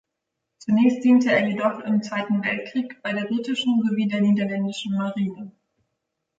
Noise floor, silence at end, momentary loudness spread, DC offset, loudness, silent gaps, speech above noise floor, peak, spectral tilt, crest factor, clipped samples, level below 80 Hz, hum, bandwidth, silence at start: -81 dBFS; 0.9 s; 10 LU; under 0.1%; -22 LUFS; none; 59 dB; -8 dBFS; -6.5 dB/octave; 16 dB; under 0.1%; -70 dBFS; none; 7.8 kHz; 0.65 s